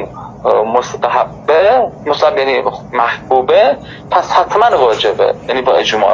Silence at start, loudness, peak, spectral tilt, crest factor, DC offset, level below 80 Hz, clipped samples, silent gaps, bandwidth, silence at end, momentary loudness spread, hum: 0 s; -12 LUFS; 0 dBFS; -4 dB/octave; 12 dB; under 0.1%; -46 dBFS; 0.1%; none; 7.6 kHz; 0 s; 6 LU; none